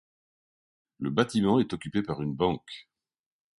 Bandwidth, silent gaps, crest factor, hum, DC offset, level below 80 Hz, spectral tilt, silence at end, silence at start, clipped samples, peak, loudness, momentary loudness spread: 11.5 kHz; none; 22 dB; none; under 0.1%; -58 dBFS; -6.5 dB/octave; 0.8 s; 1 s; under 0.1%; -8 dBFS; -28 LUFS; 12 LU